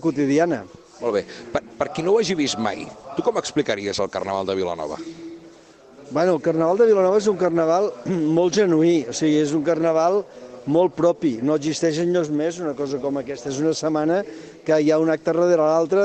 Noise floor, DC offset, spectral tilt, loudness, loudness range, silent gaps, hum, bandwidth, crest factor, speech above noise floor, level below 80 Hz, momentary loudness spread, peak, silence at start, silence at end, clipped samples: -47 dBFS; under 0.1%; -5.5 dB/octave; -21 LUFS; 6 LU; none; none; 8.8 kHz; 14 dB; 27 dB; -60 dBFS; 11 LU; -6 dBFS; 0 s; 0 s; under 0.1%